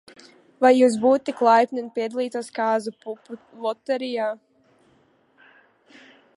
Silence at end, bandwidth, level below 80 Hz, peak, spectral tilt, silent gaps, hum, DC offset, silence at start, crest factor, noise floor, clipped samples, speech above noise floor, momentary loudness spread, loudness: 2 s; 11.5 kHz; -74 dBFS; -4 dBFS; -4.5 dB/octave; none; none; under 0.1%; 0.6 s; 20 dB; -61 dBFS; under 0.1%; 39 dB; 19 LU; -22 LUFS